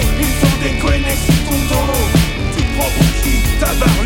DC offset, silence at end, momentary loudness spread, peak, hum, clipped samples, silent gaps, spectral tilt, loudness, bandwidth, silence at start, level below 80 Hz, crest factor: under 0.1%; 0 s; 3 LU; -2 dBFS; none; under 0.1%; none; -4.5 dB/octave; -15 LUFS; 17 kHz; 0 s; -18 dBFS; 12 dB